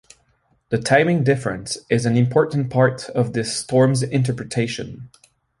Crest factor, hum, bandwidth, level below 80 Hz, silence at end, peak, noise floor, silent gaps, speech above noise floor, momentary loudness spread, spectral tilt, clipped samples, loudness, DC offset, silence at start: 20 dB; none; 11.5 kHz; -54 dBFS; 0.55 s; 0 dBFS; -63 dBFS; none; 44 dB; 9 LU; -6 dB/octave; under 0.1%; -20 LUFS; under 0.1%; 0.7 s